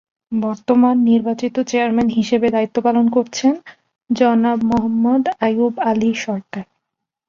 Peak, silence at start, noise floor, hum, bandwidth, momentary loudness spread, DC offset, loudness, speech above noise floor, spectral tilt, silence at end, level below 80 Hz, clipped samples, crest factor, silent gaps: -2 dBFS; 0.3 s; -79 dBFS; none; 7.4 kHz; 9 LU; under 0.1%; -17 LUFS; 63 dB; -5.5 dB/octave; 0.65 s; -54 dBFS; under 0.1%; 14 dB; none